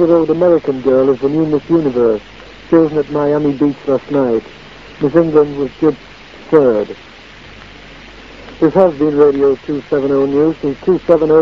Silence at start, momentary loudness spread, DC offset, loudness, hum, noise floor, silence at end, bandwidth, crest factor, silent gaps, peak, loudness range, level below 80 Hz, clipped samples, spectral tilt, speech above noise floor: 0 s; 8 LU; 0.4%; -13 LUFS; none; -36 dBFS; 0 s; 7 kHz; 14 dB; none; 0 dBFS; 3 LU; -44 dBFS; 0.1%; -8.5 dB/octave; 24 dB